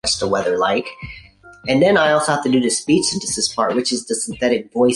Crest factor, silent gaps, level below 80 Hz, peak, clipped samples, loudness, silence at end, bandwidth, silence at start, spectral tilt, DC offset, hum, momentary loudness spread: 16 dB; none; -48 dBFS; -2 dBFS; under 0.1%; -17 LUFS; 0 s; 11.5 kHz; 0.05 s; -3.5 dB/octave; under 0.1%; none; 9 LU